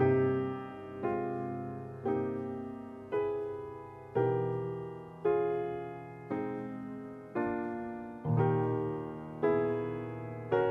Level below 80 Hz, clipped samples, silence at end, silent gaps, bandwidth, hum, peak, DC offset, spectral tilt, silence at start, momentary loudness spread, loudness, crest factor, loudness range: -66 dBFS; under 0.1%; 0 s; none; 4 kHz; none; -16 dBFS; under 0.1%; -10 dB/octave; 0 s; 13 LU; -35 LUFS; 18 dB; 3 LU